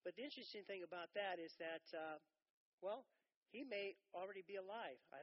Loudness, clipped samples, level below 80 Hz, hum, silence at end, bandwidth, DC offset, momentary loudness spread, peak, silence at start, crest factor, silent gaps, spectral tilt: -52 LUFS; under 0.1%; under -90 dBFS; none; 0 s; 5.8 kHz; under 0.1%; 7 LU; -34 dBFS; 0.05 s; 18 dB; 2.50-2.78 s, 3.36-3.42 s; -1 dB/octave